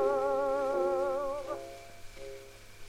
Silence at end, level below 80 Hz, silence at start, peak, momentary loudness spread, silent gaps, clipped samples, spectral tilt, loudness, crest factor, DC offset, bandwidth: 0 s; -56 dBFS; 0 s; -20 dBFS; 19 LU; none; under 0.1%; -5 dB/octave; -32 LUFS; 14 dB; under 0.1%; 15.5 kHz